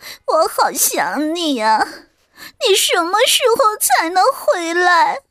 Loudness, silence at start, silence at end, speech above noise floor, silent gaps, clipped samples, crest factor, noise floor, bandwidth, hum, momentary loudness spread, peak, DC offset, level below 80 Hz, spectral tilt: -15 LUFS; 0 s; 0.1 s; 26 dB; none; under 0.1%; 14 dB; -41 dBFS; 16 kHz; none; 6 LU; -2 dBFS; under 0.1%; -62 dBFS; 0 dB/octave